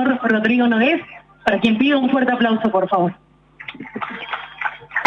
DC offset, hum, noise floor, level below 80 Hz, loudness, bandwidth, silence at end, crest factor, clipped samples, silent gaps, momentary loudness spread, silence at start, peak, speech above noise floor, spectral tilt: under 0.1%; none; -38 dBFS; -58 dBFS; -18 LUFS; 6.8 kHz; 0 s; 16 dB; under 0.1%; none; 15 LU; 0 s; -2 dBFS; 21 dB; -7 dB/octave